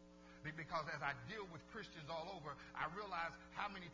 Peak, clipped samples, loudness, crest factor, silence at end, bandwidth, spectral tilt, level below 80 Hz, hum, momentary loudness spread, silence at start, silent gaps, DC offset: -26 dBFS; under 0.1%; -48 LUFS; 24 dB; 0 s; 7.6 kHz; -5 dB/octave; -70 dBFS; none; 8 LU; 0 s; none; under 0.1%